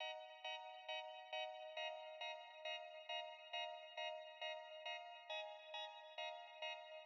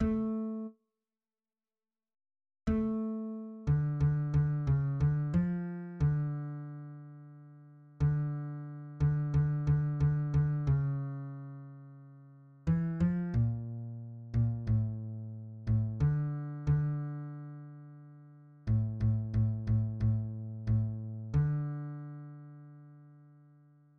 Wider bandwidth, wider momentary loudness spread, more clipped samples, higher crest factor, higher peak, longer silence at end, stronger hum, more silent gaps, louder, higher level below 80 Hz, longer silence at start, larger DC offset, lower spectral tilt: first, 7 kHz vs 2.8 kHz; second, 3 LU vs 17 LU; neither; about the same, 16 dB vs 14 dB; second, -36 dBFS vs -20 dBFS; second, 0 s vs 0.75 s; neither; neither; second, -50 LUFS vs -33 LUFS; second, under -90 dBFS vs -48 dBFS; about the same, 0 s vs 0 s; neither; second, 9.5 dB/octave vs -11 dB/octave